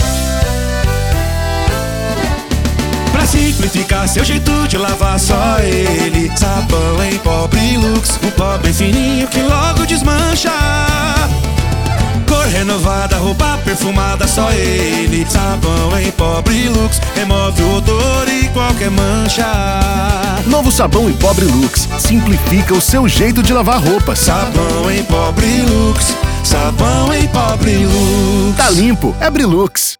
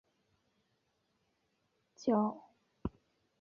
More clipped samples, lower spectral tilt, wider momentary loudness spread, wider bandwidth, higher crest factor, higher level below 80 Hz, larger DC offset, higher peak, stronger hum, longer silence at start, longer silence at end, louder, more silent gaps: neither; second, -4.5 dB/octave vs -7.5 dB/octave; second, 4 LU vs 14 LU; first, over 20 kHz vs 7 kHz; second, 12 dB vs 22 dB; first, -18 dBFS vs -64 dBFS; neither; first, 0 dBFS vs -20 dBFS; neither; second, 0 s vs 2 s; second, 0.05 s vs 0.5 s; first, -12 LUFS vs -36 LUFS; neither